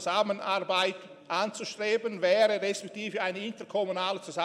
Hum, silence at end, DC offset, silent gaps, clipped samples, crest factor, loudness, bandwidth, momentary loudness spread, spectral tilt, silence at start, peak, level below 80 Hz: none; 0 s; under 0.1%; none; under 0.1%; 18 dB; -29 LUFS; 13.5 kHz; 9 LU; -3 dB/octave; 0 s; -12 dBFS; -82 dBFS